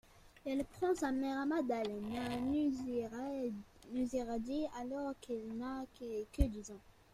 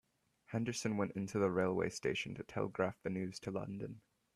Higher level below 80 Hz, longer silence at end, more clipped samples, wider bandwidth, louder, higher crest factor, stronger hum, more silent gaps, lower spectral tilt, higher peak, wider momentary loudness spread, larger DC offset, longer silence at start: first, -52 dBFS vs -70 dBFS; about the same, 0.25 s vs 0.35 s; neither; about the same, 14.5 kHz vs 13.5 kHz; about the same, -40 LUFS vs -39 LUFS; about the same, 22 dB vs 20 dB; neither; neither; about the same, -6 dB/octave vs -5.5 dB/octave; about the same, -18 dBFS vs -20 dBFS; about the same, 9 LU vs 9 LU; neither; second, 0.15 s vs 0.5 s